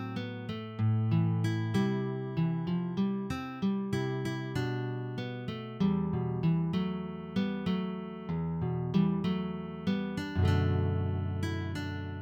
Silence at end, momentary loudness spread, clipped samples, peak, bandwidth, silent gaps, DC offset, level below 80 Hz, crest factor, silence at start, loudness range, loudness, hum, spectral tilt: 0 s; 9 LU; under 0.1%; -16 dBFS; 10 kHz; none; under 0.1%; -56 dBFS; 16 dB; 0 s; 2 LU; -32 LUFS; none; -8 dB/octave